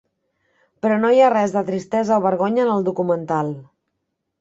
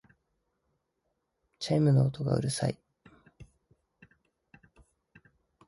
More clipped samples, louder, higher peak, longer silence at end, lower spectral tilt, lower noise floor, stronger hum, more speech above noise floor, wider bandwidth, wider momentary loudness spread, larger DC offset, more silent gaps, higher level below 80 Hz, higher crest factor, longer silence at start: neither; first, -19 LUFS vs -29 LUFS; first, -2 dBFS vs -14 dBFS; second, 0.8 s vs 2.25 s; about the same, -7 dB/octave vs -6.5 dB/octave; second, -76 dBFS vs -80 dBFS; neither; first, 58 dB vs 54 dB; second, 7.8 kHz vs 11.5 kHz; second, 9 LU vs 13 LU; neither; neither; about the same, -64 dBFS vs -62 dBFS; about the same, 16 dB vs 20 dB; second, 0.85 s vs 1.6 s